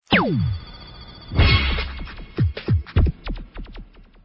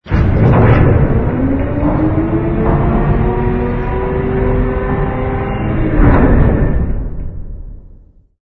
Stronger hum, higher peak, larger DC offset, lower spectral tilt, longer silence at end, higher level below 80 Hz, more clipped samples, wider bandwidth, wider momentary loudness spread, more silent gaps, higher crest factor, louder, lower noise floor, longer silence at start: neither; second, -4 dBFS vs 0 dBFS; neither; second, -9 dB/octave vs -11.5 dB/octave; about the same, 0.4 s vs 0.5 s; second, -26 dBFS vs -18 dBFS; neither; first, 5.8 kHz vs 4.8 kHz; first, 23 LU vs 10 LU; neither; first, 18 dB vs 12 dB; second, -22 LUFS vs -14 LUFS; about the same, -41 dBFS vs -41 dBFS; about the same, 0.1 s vs 0.05 s